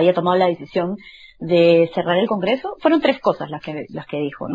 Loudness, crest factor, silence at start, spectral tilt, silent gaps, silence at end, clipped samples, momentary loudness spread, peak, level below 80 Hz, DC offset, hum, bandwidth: -19 LUFS; 16 dB; 0 s; -8 dB/octave; none; 0 s; under 0.1%; 15 LU; -2 dBFS; -56 dBFS; under 0.1%; none; 7.4 kHz